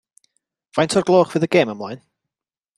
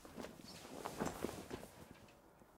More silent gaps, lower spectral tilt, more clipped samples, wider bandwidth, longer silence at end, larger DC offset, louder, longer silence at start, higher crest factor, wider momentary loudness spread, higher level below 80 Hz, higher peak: neither; about the same, -5.5 dB/octave vs -4.5 dB/octave; neither; second, 12.5 kHz vs 16 kHz; first, 0.8 s vs 0 s; neither; first, -18 LUFS vs -49 LUFS; first, 0.75 s vs 0 s; second, 18 dB vs 24 dB; about the same, 16 LU vs 17 LU; first, -62 dBFS vs -68 dBFS; first, -2 dBFS vs -26 dBFS